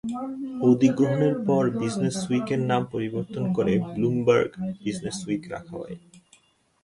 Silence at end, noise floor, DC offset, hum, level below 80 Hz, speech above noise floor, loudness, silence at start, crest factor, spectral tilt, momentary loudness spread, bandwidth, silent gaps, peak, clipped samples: 0.65 s; -60 dBFS; under 0.1%; none; -58 dBFS; 36 dB; -25 LUFS; 0.05 s; 20 dB; -7 dB/octave; 12 LU; 11.5 kHz; none; -6 dBFS; under 0.1%